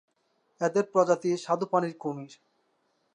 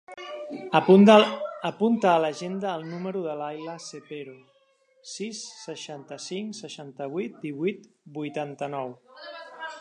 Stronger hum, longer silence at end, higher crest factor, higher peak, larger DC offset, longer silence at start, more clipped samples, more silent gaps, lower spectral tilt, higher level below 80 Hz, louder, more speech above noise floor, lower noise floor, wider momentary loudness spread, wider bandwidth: neither; first, 0.8 s vs 0 s; about the same, 20 dB vs 24 dB; second, -10 dBFS vs -2 dBFS; neither; first, 0.6 s vs 0.1 s; neither; neither; about the same, -6 dB/octave vs -5.5 dB/octave; second, -84 dBFS vs -78 dBFS; second, -28 LUFS vs -24 LUFS; first, 46 dB vs 39 dB; first, -73 dBFS vs -64 dBFS; second, 12 LU vs 22 LU; about the same, 10.5 kHz vs 10.5 kHz